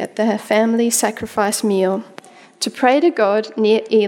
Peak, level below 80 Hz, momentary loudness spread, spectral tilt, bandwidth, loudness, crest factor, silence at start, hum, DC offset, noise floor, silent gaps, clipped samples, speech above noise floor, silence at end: -2 dBFS; -60 dBFS; 6 LU; -3.5 dB/octave; 17.5 kHz; -17 LUFS; 16 dB; 0 s; none; under 0.1%; -41 dBFS; none; under 0.1%; 25 dB; 0 s